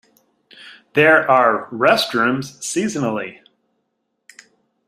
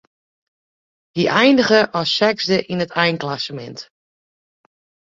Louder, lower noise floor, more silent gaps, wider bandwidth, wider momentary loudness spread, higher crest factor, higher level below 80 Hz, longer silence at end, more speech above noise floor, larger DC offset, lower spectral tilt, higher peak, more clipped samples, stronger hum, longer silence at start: about the same, -17 LUFS vs -17 LUFS; second, -72 dBFS vs under -90 dBFS; neither; first, 15.5 kHz vs 7.8 kHz; second, 11 LU vs 16 LU; about the same, 18 dB vs 18 dB; about the same, -64 dBFS vs -60 dBFS; first, 1.55 s vs 1.25 s; second, 56 dB vs over 73 dB; neither; about the same, -4 dB/octave vs -5 dB/octave; about the same, -2 dBFS vs -2 dBFS; neither; neither; second, 0.6 s vs 1.15 s